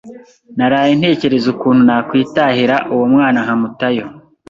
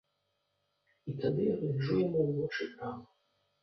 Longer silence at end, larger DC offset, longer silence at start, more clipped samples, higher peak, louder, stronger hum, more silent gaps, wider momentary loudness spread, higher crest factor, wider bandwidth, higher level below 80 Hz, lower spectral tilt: second, 0.3 s vs 0.6 s; neither; second, 0.05 s vs 1.05 s; neither; first, 0 dBFS vs -18 dBFS; first, -13 LUFS vs -33 LUFS; neither; neither; second, 7 LU vs 13 LU; about the same, 12 dB vs 16 dB; first, 7.2 kHz vs 6.2 kHz; first, -52 dBFS vs -68 dBFS; second, -7 dB/octave vs -8.5 dB/octave